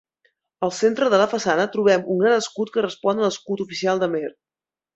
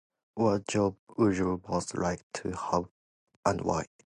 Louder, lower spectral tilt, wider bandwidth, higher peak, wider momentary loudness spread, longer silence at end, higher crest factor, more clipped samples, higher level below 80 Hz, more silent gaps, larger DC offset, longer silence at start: first, -21 LUFS vs -30 LUFS; second, -4.5 dB/octave vs -6 dB/octave; second, 8.2 kHz vs 11.5 kHz; first, -4 dBFS vs -10 dBFS; about the same, 9 LU vs 9 LU; first, 0.65 s vs 0.2 s; about the same, 18 dB vs 20 dB; neither; second, -68 dBFS vs -54 dBFS; second, none vs 0.99-1.07 s, 2.23-2.30 s, 2.91-3.27 s, 3.36-3.43 s; neither; first, 0.6 s vs 0.35 s